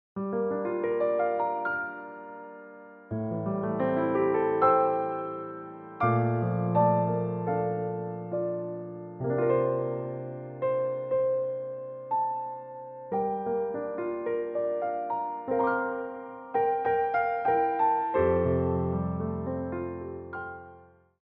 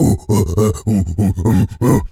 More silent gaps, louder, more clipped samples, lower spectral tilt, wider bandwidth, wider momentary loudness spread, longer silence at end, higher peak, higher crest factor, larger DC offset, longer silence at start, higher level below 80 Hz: neither; second, -29 LUFS vs -16 LUFS; neither; about the same, -8.5 dB/octave vs -7.5 dB/octave; second, 4.3 kHz vs 16.5 kHz; first, 14 LU vs 3 LU; first, 0.4 s vs 0.05 s; second, -10 dBFS vs -2 dBFS; first, 20 dB vs 14 dB; neither; first, 0.15 s vs 0 s; second, -56 dBFS vs -30 dBFS